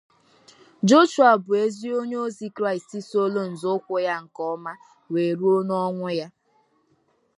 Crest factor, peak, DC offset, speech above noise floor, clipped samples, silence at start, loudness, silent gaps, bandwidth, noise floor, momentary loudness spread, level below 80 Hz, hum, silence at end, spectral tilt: 20 dB; -4 dBFS; under 0.1%; 44 dB; under 0.1%; 0.85 s; -23 LUFS; none; 11.5 kHz; -66 dBFS; 14 LU; -78 dBFS; none; 1.1 s; -5.5 dB/octave